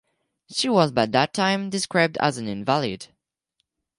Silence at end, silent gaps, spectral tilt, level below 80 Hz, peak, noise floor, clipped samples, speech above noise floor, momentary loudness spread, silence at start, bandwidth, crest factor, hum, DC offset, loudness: 0.95 s; none; -4.5 dB/octave; -62 dBFS; -4 dBFS; -76 dBFS; under 0.1%; 54 dB; 9 LU; 0.5 s; 11.5 kHz; 20 dB; none; under 0.1%; -22 LUFS